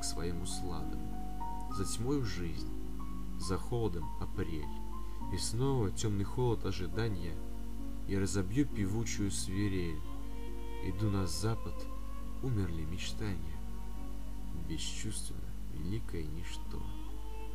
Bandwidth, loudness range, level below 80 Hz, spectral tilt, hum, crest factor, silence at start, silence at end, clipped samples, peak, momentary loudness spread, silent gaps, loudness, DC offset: 15.5 kHz; 6 LU; -42 dBFS; -5.5 dB/octave; none; 18 dB; 0 s; 0 s; under 0.1%; -20 dBFS; 11 LU; none; -39 LUFS; 1%